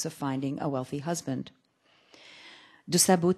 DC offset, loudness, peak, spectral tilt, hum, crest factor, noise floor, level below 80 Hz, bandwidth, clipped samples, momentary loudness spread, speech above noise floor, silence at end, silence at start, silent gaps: under 0.1%; -29 LUFS; -8 dBFS; -4 dB/octave; none; 22 dB; -66 dBFS; -72 dBFS; 13 kHz; under 0.1%; 26 LU; 38 dB; 0 s; 0 s; none